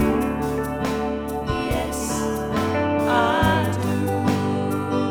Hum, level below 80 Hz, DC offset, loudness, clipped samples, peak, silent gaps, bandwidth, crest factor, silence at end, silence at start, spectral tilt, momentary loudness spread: none; -38 dBFS; under 0.1%; -22 LUFS; under 0.1%; -6 dBFS; none; 20 kHz; 16 dB; 0 s; 0 s; -5.5 dB/octave; 6 LU